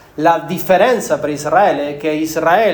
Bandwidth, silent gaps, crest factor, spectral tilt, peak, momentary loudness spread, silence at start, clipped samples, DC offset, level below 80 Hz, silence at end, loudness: over 20 kHz; none; 14 dB; -4.5 dB/octave; 0 dBFS; 7 LU; 0.15 s; under 0.1%; under 0.1%; -52 dBFS; 0 s; -15 LUFS